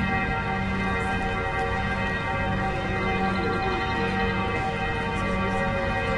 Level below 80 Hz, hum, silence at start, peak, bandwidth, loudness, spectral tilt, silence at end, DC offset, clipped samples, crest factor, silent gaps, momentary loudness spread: -36 dBFS; none; 0 s; -12 dBFS; 11 kHz; -26 LUFS; -6.5 dB/octave; 0 s; under 0.1%; under 0.1%; 14 dB; none; 2 LU